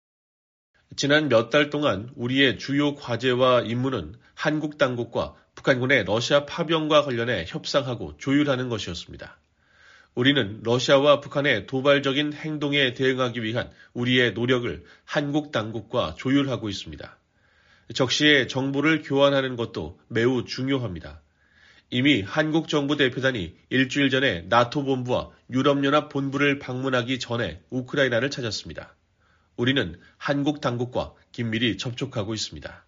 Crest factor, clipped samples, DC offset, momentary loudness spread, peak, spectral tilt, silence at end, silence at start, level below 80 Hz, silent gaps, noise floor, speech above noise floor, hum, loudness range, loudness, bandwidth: 20 dB; under 0.1%; under 0.1%; 12 LU; -4 dBFS; -3.5 dB/octave; 0.1 s; 0.9 s; -54 dBFS; none; -64 dBFS; 40 dB; none; 5 LU; -24 LUFS; 7.4 kHz